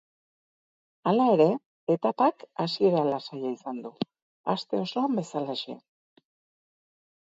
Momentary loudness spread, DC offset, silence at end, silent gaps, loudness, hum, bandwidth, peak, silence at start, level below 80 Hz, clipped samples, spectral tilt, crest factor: 14 LU; under 0.1%; 1.6 s; 1.66-1.87 s, 4.22-4.44 s; -27 LUFS; none; 8 kHz; -8 dBFS; 1.05 s; -78 dBFS; under 0.1%; -7 dB/octave; 20 dB